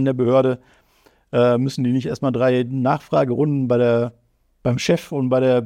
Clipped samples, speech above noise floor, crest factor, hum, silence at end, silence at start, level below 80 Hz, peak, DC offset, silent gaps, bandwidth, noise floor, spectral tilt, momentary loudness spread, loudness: under 0.1%; 39 dB; 14 dB; none; 0 s; 0 s; -56 dBFS; -6 dBFS; under 0.1%; none; 14 kHz; -57 dBFS; -7 dB/octave; 6 LU; -19 LUFS